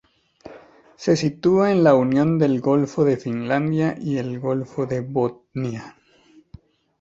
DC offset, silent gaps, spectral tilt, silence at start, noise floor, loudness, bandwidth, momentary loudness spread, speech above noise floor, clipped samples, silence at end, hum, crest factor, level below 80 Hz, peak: under 0.1%; none; -7.5 dB/octave; 0.45 s; -54 dBFS; -21 LUFS; 8 kHz; 12 LU; 34 dB; under 0.1%; 1.1 s; none; 20 dB; -58 dBFS; -2 dBFS